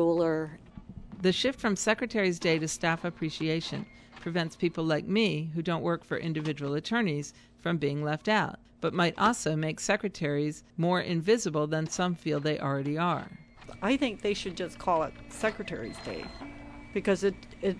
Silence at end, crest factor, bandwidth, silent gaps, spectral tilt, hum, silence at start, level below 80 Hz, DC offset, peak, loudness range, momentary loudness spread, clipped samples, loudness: 0 s; 18 dB; 11 kHz; none; -5 dB/octave; none; 0 s; -56 dBFS; under 0.1%; -12 dBFS; 4 LU; 12 LU; under 0.1%; -30 LUFS